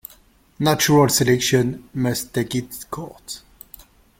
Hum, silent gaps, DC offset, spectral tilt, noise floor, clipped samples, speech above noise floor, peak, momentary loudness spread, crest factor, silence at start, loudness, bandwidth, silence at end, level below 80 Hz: none; none; under 0.1%; -4.5 dB/octave; -53 dBFS; under 0.1%; 33 dB; -2 dBFS; 19 LU; 18 dB; 0.6 s; -19 LUFS; 17 kHz; 0.8 s; -50 dBFS